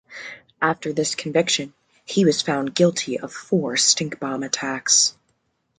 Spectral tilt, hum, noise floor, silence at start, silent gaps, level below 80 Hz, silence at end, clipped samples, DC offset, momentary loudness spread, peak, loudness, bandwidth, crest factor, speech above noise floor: -2.5 dB/octave; none; -70 dBFS; 0.1 s; none; -66 dBFS; 0.7 s; under 0.1%; under 0.1%; 11 LU; -4 dBFS; -20 LUFS; 11 kHz; 20 dB; 48 dB